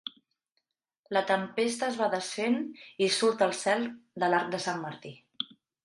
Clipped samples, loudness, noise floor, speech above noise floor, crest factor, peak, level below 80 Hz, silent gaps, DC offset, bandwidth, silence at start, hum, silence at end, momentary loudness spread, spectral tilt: under 0.1%; -30 LUFS; -81 dBFS; 52 dB; 18 dB; -12 dBFS; -80 dBFS; 0.51-0.55 s, 0.99-1.04 s; under 0.1%; 11.5 kHz; 0.05 s; none; 0.4 s; 13 LU; -3.5 dB/octave